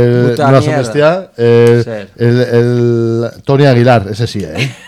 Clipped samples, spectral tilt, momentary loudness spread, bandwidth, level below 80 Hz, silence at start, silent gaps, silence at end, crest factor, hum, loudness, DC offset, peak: 0.8%; -7.5 dB/octave; 9 LU; 12.5 kHz; -46 dBFS; 0 s; none; 0.15 s; 10 dB; none; -10 LUFS; under 0.1%; 0 dBFS